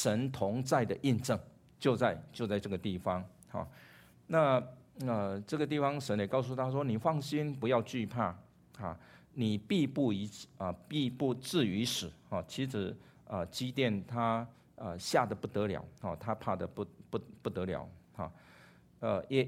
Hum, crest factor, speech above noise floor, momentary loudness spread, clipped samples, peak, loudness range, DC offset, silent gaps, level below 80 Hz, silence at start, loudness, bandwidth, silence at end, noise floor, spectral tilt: none; 22 dB; 26 dB; 12 LU; under 0.1%; -12 dBFS; 3 LU; under 0.1%; none; -66 dBFS; 0 s; -35 LUFS; 16 kHz; 0 s; -60 dBFS; -6 dB/octave